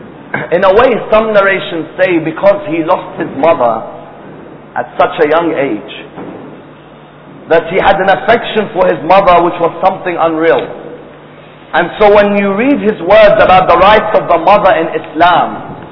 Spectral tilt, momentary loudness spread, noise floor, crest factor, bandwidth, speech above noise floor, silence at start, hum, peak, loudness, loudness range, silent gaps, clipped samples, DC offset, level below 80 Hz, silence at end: -7.5 dB/octave; 15 LU; -35 dBFS; 10 dB; 5.4 kHz; 26 dB; 0 s; none; 0 dBFS; -9 LUFS; 7 LU; none; 2%; under 0.1%; -38 dBFS; 0 s